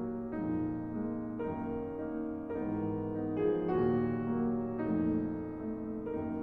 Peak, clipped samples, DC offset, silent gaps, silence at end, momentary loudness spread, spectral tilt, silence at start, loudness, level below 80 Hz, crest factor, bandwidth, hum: -20 dBFS; under 0.1%; under 0.1%; none; 0 s; 7 LU; -11 dB/octave; 0 s; -35 LUFS; -56 dBFS; 14 dB; 4.4 kHz; none